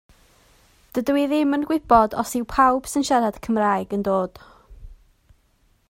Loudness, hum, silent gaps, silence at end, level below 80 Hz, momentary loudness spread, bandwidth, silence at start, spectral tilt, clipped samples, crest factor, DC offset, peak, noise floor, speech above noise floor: -21 LUFS; none; none; 0.95 s; -48 dBFS; 8 LU; 16 kHz; 0.95 s; -5 dB/octave; under 0.1%; 20 dB; under 0.1%; -2 dBFS; -62 dBFS; 42 dB